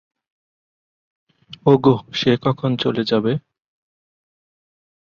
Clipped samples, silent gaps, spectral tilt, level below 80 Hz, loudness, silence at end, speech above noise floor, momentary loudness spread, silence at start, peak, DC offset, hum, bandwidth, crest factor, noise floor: under 0.1%; none; -7.5 dB/octave; -58 dBFS; -18 LUFS; 1.7 s; over 73 dB; 7 LU; 1.65 s; -2 dBFS; under 0.1%; none; 7.2 kHz; 20 dB; under -90 dBFS